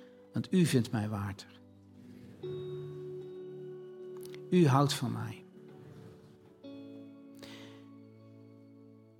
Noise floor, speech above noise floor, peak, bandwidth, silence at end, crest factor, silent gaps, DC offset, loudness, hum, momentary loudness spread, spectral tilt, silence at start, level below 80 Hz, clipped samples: -57 dBFS; 27 dB; -14 dBFS; 16.5 kHz; 0.25 s; 22 dB; none; under 0.1%; -33 LUFS; none; 26 LU; -6.5 dB/octave; 0 s; -76 dBFS; under 0.1%